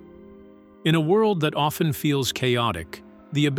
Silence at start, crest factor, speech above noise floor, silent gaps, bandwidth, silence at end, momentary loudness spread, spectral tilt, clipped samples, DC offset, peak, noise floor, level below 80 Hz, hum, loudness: 0 s; 16 dB; 26 dB; none; 17 kHz; 0 s; 11 LU; -5.5 dB/octave; under 0.1%; under 0.1%; -8 dBFS; -48 dBFS; -54 dBFS; none; -23 LUFS